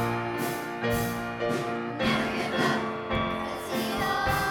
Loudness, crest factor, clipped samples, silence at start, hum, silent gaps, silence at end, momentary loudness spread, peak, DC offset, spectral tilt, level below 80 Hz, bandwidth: -28 LUFS; 18 dB; under 0.1%; 0 s; none; none; 0 s; 5 LU; -12 dBFS; under 0.1%; -5 dB/octave; -48 dBFS; over 20 kHz